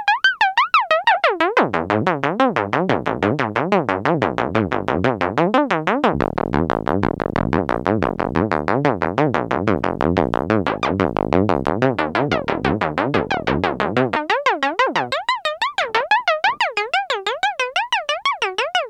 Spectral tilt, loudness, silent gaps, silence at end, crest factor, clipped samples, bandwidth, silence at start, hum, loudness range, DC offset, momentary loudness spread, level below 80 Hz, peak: -5.5 dB/octave; -19 LUFS; none; 0 s; 18 dB; under 0.1%; 12 kHz; 0 s; none; 2 LU; under 0.1%; 4 LU; -42 dBFS; 0 dBFS